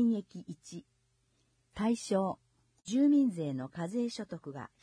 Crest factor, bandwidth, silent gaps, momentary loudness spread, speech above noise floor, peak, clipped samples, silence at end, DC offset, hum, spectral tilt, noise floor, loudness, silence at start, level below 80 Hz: 14 dB; 10.5 kHz; none; 21 LU; 42 dB; -20 dBFS; under 0.1%; 0.15 s; under 0.1%; none; -6.5 dB/octave; -74 dBFS; -33 LUFS; 0 s; -70 dBFS